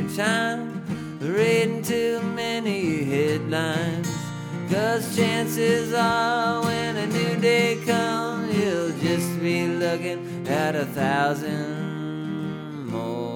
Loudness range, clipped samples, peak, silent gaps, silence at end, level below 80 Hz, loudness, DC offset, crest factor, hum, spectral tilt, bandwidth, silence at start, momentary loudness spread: 3 LU; under 0.1%; -8 dBFS; none; 0 s; -62 dBFS; -24 LUFS; under 0.1%; 16 dB; none; -5 dB/octave; 19.5 kHz; 0 s; 9 LU